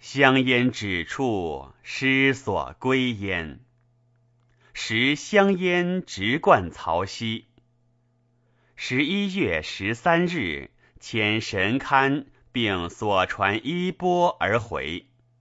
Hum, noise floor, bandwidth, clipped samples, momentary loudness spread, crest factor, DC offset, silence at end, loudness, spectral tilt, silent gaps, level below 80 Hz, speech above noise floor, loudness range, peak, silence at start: none; -65 dBFS; 8 kHz; under 0.1%; 11 LU; 22 dB; under 0.1%; 0.4 s; -23 LUFS; -5 dB/octave; none; -54 dBFS; 42 dB; 3 LU; -2 dBFS; 0 s